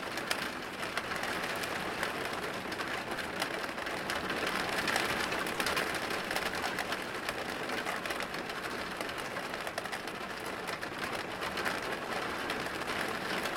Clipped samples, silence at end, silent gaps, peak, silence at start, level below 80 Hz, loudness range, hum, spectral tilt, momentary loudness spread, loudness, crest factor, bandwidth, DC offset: under 0.1%; 0 s; none; -12 dBFS; 0 s; -62 dBFS; 4 LU; none; -2.5 dB/octave; 6 LU; -35 LUFS; 24 dB; 17 kHz; under 0.1%